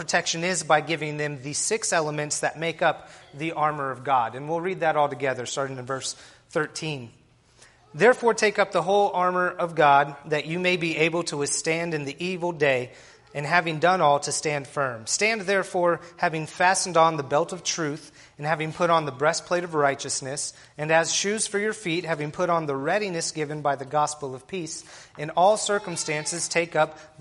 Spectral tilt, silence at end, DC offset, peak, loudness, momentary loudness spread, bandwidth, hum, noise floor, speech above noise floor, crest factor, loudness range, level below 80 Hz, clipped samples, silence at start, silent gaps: -3.5 dB/octave; 0.15 s; under 0.1%; -4 dBFS; -24 LUFS; 11 LU; 11.5 kHz; none; -56 dBFS; 31 dB; 20 dB; 4 LU; -66 dBFS; under 0.1%; 0 s; none